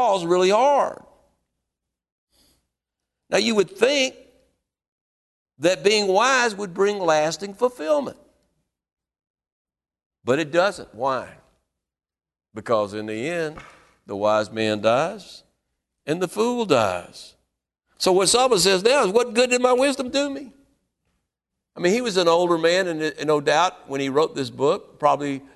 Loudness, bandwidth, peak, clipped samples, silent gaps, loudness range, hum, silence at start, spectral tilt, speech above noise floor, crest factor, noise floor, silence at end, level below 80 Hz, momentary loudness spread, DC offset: -21 LUFS; 12.5 kHz; -2 dBFS; under 0.1%; 2.12-2.27 s, 4.88-5.46 s, 8.93-8.97 s, 9.30-9.34 s, 9.52-9.65 s, 10.06-10.10 s; 8 LU; none; 0 s; -3.5 dB/octave; over 69 dB; 22 dB; under -90 dBFS; 0.15 s; -62 dBFS; 11 LU; under 0.1%